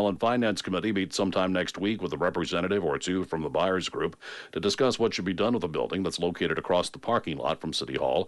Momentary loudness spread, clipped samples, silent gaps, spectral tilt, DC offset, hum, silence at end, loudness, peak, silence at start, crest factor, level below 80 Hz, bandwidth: 5 LU; under 0.1%; none; -5 dB/octave; under 0.1%; none; 0 s; -28 LUFS; -12 dBFS; 0 s; 16 dB; -58 dBFS; 11.5 kHz